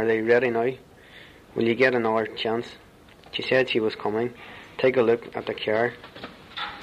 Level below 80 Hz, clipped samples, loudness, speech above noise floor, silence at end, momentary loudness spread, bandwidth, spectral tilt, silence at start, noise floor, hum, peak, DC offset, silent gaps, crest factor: -62 dBFS; under 0.1%; -24 LUFS; 24 dB; 0 s; 19 LU; 10.5 kHz; -6 dB/octave; 0 s; -48 dBFS; none; -6 dBFS; under 0.1%; none; 18 dB